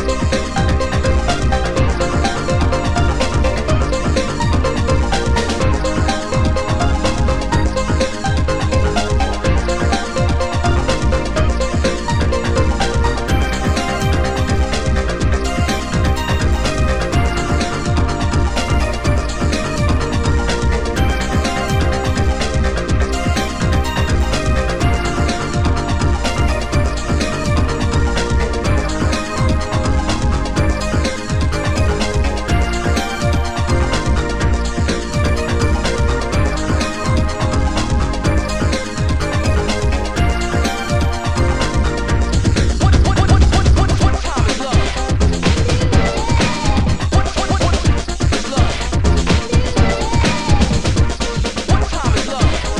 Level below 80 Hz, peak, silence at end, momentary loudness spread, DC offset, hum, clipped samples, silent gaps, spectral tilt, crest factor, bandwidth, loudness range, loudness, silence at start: -20 dBFS; -2 dBFS; 0 s; 3 LU; 4%; none; under 0.1%; none; -5.5 dB/octave; 14 dB; 12.5 kHz; 2 LU; -17 LUFS; 0 s